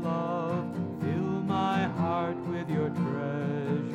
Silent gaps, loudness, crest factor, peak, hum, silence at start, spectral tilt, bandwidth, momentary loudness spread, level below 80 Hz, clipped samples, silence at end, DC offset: none; -30 LUFS; 14 dB; -16 dBFS; none; 0 s; -8.5 dB/octave; 8.4 kHz; 4 LU; -68 dBFS; under 0.1%; 0 s; under 0.1%